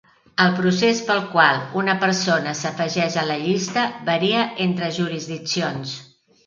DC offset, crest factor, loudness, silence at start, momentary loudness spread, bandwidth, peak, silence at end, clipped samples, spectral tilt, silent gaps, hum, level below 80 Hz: under 0.1%; 20 dB; -20 LUFS; 0.4 s; 9 LU; 7.6 kHz; 0 dBFS; 0.4 s; under 0.1%; -4.5 dB/octave; none; none; -66 dBFS